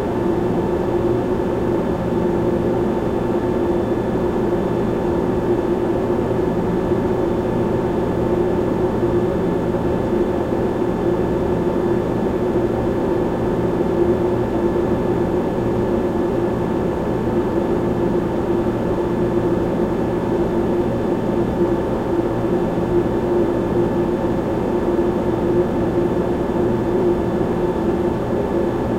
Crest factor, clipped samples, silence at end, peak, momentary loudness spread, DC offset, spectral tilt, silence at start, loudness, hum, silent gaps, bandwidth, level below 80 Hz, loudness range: 14 dB; under 0.1%; 0 s; -4 dBFS; 2 LU; under 0.1%; -8.5 dB/octave; 0 s; -19 LUFS; none; none; 13.5 kHz; -34 dBFS; 1 LU